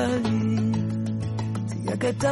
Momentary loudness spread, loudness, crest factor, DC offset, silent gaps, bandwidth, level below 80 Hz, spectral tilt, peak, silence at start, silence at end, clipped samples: 5 LU; -26 LUFS; 14 dB; under 0.1%; none; 11.5 kHz; -54 dBFS; -7 dB/octave; -10 dBFS; 0 s; 0 s; under 0.1%